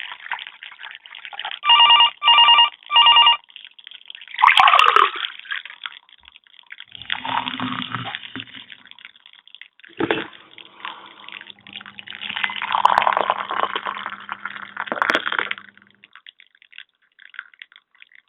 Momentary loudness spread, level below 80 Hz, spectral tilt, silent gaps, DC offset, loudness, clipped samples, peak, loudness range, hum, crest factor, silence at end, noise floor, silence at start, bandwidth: 26 LU; -66 dBFS; 2.5 dB/octave; none; under 0.1%; -16 LUFS; under 0.1%; 0 dBFS; 17 LU; none; 22 dB; 0.85 s; -52 dBFS; 0.05 s; 4.2 kHz